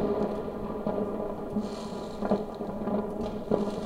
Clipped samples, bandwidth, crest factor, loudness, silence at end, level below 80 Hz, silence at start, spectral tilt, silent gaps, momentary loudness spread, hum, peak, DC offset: under 0.1%; 15 kHz; 22 dB; -32 LUFS; 0 s; -48 dBFS; 0 s; -7.5 dB/octave; none; 6 LU; none; -10 dBFS; under 0.1%